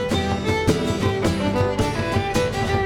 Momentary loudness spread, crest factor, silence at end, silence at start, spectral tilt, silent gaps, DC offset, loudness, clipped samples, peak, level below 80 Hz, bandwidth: 2 LU; 18 dB; 0 s; 0 s; -5.5 dB/octave; none; under 0.1%; -22 LUFS; under 0.1%; -4 dBFS; -36 dBFS; 17.5 kHz